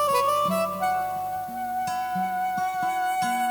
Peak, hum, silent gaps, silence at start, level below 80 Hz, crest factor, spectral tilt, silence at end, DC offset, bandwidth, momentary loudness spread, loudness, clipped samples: -12 dBFS; none; none; 0 s; -62 dBFS; 14 dB; -3.5 dB/octave; 0 s; under 0.1%; over 20 kHz; 8 LU; -26 LUFS; under 0.1%